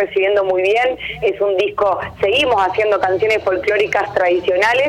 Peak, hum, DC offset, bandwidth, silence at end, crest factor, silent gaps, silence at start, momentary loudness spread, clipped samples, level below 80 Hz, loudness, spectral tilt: -6 dBFS; none; under 0.1%; 12.5 kHz; 0 s; 10 dB; none; 0 s; 4 LU; under 0.1%; -48 dBFS; -16 LUFS; -4.5 dB/octave